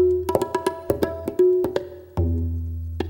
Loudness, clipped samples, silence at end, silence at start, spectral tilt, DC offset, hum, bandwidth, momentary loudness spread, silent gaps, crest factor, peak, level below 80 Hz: -24 LUFS; under 0.1%; 0 s; 0 s; -7.5 dB/octave; under 0.1%; none; 17 kHz; 11 LU; none; 20 dB; -4 dBFS; -36 dBFS